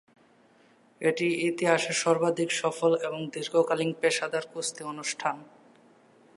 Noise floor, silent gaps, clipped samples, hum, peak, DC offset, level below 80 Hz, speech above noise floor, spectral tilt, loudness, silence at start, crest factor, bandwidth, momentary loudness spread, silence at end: -61 dBFS; none; under 0.1%; none; -8 dBFS; under 0.1%; -82 dBFS; 33 dB; -3.5 dB/octave; -28 LUFS; 1 s; 22 dB; 11.5 kHz; 8 LU; 0.95 s